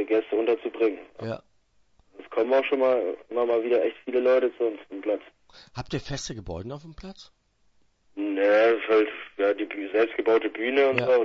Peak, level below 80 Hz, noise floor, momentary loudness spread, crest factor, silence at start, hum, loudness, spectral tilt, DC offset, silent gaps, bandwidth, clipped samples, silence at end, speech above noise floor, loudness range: -8 dBFS; -56 dBFS; -64 dBFS; 15 LU; 18 dB; 0 s; none; -25 LUFS; -5.5 dB/octave; under 0.1%; none; 7.8 kHz; under 0.1%; 0 s; 39 dB; 10 LU